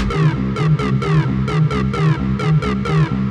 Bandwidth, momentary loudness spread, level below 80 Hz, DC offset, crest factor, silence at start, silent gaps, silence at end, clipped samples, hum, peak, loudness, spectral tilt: 8.6 kHz; 2 LU; -30 dBFS; under 0.1%; 12 dB; 0 s; none; 0 s; under 0.1%; none; -4 dBFS; -17 LUFS; -8 dB/octave